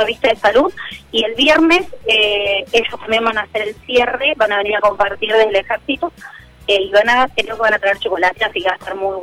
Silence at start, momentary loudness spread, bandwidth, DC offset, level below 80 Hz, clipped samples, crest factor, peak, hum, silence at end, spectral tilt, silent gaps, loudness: 0 s; 9 LU; 15.5 kHz; under 0.1%; -46 dBFS; under 0.1%; 12 dB; -2 dBFS; none; 0 s; -3 dB/octave; none; -15 LUFS